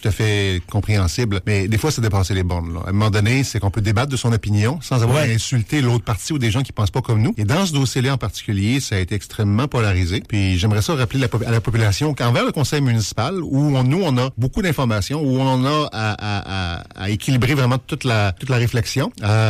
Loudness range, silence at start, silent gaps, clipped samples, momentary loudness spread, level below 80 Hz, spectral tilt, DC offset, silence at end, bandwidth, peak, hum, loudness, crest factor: 1 LU; 0 s; none; under 0.1%; 5 LU; -40 dBFS; -5.5 dB/octave; under 0.1%; 0 s; 15 kHz; -8 dBFS; none; -19 LUFS; 10 dB